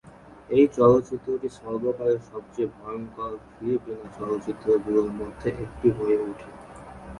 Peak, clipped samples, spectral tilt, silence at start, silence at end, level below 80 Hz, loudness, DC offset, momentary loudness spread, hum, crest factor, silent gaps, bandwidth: -6 dBFS; under 0.1%; -8.5 dB/octave; 0.05 s; 0 s; -52 dBFS; -25 LUFS; under 0.1%; 17 LU; none; 20 dB; none; 11 kHz